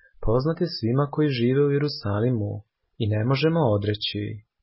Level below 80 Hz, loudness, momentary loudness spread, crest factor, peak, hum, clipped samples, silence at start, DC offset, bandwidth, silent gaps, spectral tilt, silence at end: -44 dBFS; -24 LUFS; 9 LU; 16 dB; -8 dBFS; none; under 0.1%; 0.2 s; under 0.1%; 5.8 kHz; none; -11 dB/octave; 0.2 s